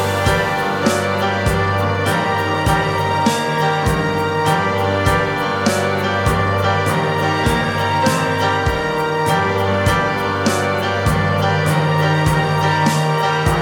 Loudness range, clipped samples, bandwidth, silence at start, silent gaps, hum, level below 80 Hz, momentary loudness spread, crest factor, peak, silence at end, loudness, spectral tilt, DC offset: 1 LU; under 0.1%; 18 kHz; 0 s; none; none; -34 dBFS; 2 LU; 16 dB; -2 dBFS; 0 s; -17 LUFS; -5 dB/octave; under 0.1%